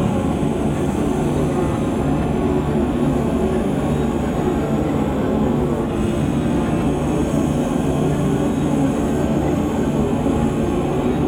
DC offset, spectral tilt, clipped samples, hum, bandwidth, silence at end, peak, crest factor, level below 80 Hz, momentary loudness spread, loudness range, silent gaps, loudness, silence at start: under 0.1%; -7.5 dB/octave; under 0.1%; none; 16.5 kHz; 0 s; -6 dBFS; 12 dB; -32 dBFS; 1 LU; 1 LU; none; -19 LUFS; 0 s